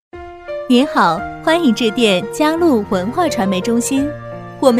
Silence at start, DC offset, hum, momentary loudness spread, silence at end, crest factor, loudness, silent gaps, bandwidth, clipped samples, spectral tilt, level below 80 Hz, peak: 0.15 s; under 0.1%; none; 14 LU; 0 s; 16 dB; -15 LUFS; none; 15.5 kHz; under 0.1%; -4.5 dB/octave; -44 dBFS; 0 dBFS